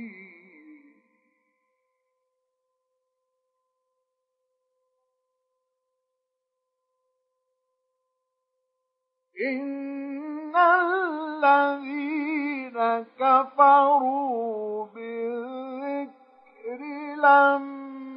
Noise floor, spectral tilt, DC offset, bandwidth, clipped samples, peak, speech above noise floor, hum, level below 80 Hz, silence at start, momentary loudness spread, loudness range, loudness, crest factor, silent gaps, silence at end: -82 dBFS; -7 dB/octave; under 0.1%; 5.4 kHz; under 0.1%; -6 dBFS; 62 dB; none; under -90 dBFS; 0 s; 18 LU; 14 LU; -23 LUFS; 22 dB; none; 0 s